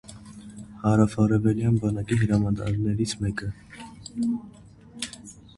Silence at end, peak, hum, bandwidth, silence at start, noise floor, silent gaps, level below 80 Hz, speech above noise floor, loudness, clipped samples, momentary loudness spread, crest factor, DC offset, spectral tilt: 0.15 s; -6 dBFS; none; 11.5 kHz; 0.1 s; -45 dBFS; none; -46 dBFS; 22 dB; -25 LUFS; under 0.1%; 21 LU; 20 dB; under 0.1%; -7 dB/octave